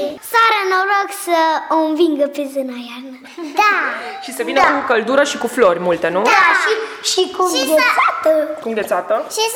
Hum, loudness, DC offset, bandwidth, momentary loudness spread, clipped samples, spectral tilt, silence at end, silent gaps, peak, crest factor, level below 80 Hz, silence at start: none; -15 LUFS; under 0.1%; over 20 kHz; 11 LU; under 0.1%; -2.5 dB/octave; 0 s; none; -2 dBFS; 14 dB; -58 dBFS; 0 s